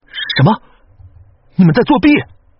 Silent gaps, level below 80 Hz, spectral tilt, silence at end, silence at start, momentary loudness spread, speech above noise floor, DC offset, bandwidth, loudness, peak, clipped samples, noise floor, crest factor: none; -40 dBFS; -5.5 dB/octave; 0.35 s; 0.15 s; 9 LU; 34 dB; under 0.1%; 5.8 kHz; -12 LUFS; 0 dBFS; under 0.1%; -44 dBFS; 14 dB